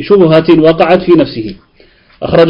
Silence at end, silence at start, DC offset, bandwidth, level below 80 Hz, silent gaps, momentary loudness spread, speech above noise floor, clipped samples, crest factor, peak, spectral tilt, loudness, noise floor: 0 s; 0 s; under 0.1%; 5.6 kHz; -38 dBFS; none; 16 LU; 37 dB; 1%; 8 dB; 0 dBFS; -9 dB/octave; -8 LUFS; -44 dBFS